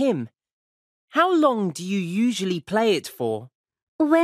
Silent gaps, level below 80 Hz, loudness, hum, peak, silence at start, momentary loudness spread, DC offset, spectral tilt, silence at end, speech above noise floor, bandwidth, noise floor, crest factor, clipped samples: 0.53-1.08 s, 3.55-3.64 s, 3.83-3.99 s; -72 dBFS; -23 LUFS; none; -6 dBFS; 0 s; 9 LU; under 0.1%; -5.5 dB/octave; 0 s; over 68 dB; 15.5 kHz; under -90 dBFS; 18 dB; under 0.1%